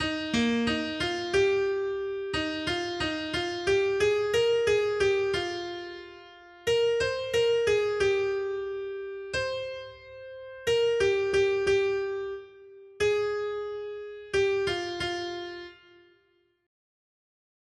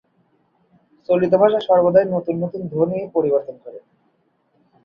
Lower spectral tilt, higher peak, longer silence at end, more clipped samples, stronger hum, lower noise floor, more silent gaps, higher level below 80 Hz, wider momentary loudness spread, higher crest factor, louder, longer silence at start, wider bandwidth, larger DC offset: second, -4 dB/octave vs -9.5 dB/octave; second, -14 dBFS vs -2 dBFS; first, 1.9 s vs 1.05 s; neither; neither; first, -69 dBFS vs -64 dBFS; neither; first, -56 dBFS vs -62 dBFS; second, 14 LU vs 21 LU; about the same, 16 dB vs 18 dB; second, -28 LUFS vs -18 LUFS; second, 0 s vs 1.1 s; first, 12.5 kHz vs 5.2 kHz; neither